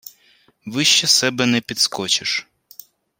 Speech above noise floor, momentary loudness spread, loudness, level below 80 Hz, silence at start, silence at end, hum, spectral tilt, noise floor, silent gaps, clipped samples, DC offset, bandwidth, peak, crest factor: 38 dB; 10 LU; -17 LUFS; -64 dBFS; 0.05 s; 0.8 s; none; -1.5 dB/octave; -57 dBFS; none; under 0.1%; under 0.1%; 16.5 kHz; -2 dBFS; 20 dB